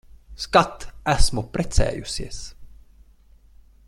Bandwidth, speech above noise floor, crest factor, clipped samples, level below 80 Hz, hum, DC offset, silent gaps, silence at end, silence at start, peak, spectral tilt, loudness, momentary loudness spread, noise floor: 12 kHz; 32 dB; 22 dB; under 0.1%; -30 dBFS; none; under 0.1%; none; 1.2 s; 0.3 s; -2 dBFS; -4 dB/octave; -24 LUFS; 16 LU; -52 dBFS